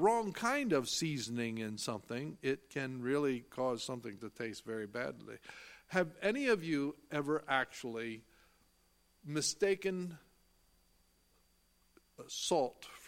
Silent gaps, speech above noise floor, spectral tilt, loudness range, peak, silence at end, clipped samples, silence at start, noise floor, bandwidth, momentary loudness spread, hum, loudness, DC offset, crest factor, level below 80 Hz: none; 35 dB; -4 dB/octave; 4 LU; -16 dBFS; 0 s; under 0.1%; 0 s; -72 dBFS; 16.5 kHz; 13 LU; none; -37 LUFS; under 0.1%; 22 dB; -74 dBFS